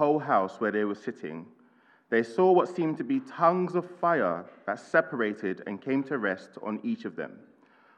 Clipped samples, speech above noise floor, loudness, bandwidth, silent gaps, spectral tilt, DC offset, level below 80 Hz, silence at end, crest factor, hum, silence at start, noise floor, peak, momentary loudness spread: under 0.1%; 34 dB; -28 LUFS; 9 kHz; none; -7.5 dB/octave; under 0.1%; -90 dBFS; 0.6 s; 20 dB; none; 0 s; -62 dBFS; -8 dBFS; 12 LU